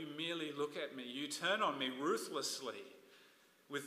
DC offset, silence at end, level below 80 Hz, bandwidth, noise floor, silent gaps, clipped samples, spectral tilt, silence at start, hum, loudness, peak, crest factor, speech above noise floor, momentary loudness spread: under 0.1%; 0 s; under -90 dBFS; 15.5 kHz; -68 dBFS; none; under 0.1%; -2.5 dB/octave; 0 s; none; -40 LUFS; -22 dBFS; 18 dB; 27 dB; 11 LU